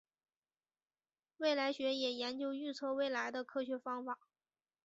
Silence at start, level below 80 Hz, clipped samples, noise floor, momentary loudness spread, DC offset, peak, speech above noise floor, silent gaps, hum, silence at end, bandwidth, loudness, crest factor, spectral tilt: 1.4 s; -88 dBFS; under 0.1%; under -90 dBFS; 7 LU; under 0.1%; -20 dBFS; over 51 dB; none; none; 0.7 s; 7.6 kHz; -39 LUFS; 20 dB; 0.5 dB/octave